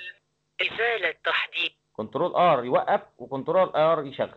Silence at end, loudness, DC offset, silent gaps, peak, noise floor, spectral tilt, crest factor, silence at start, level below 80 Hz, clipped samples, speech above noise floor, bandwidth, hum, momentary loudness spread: 0.05 s; -24 LUFS; under 0.1%; none; -10 dBFS; -52 dBFS; -6.5 dB/octave; 14 dB; 0 s; -70 dBFS; under 0.1%; 28 dB; 7.2 kHz; none; 13 LU